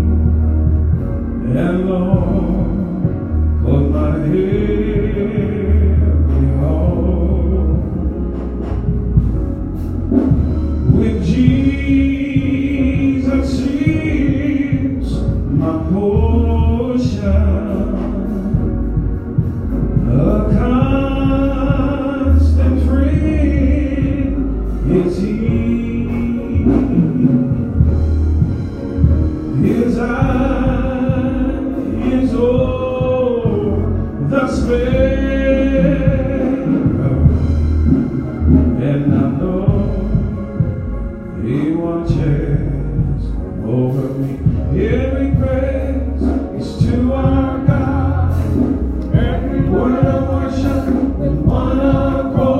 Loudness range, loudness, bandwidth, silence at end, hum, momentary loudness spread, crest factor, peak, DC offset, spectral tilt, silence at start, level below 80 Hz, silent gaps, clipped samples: 3 LU; -16 LUFS; 7.2 kHz; 0 s; none; 6 LU; 14 dB; 0 dBFS; under 0.1%; -9.5 dB/octave; 0 s; -22 dBFS; none; under 0.1%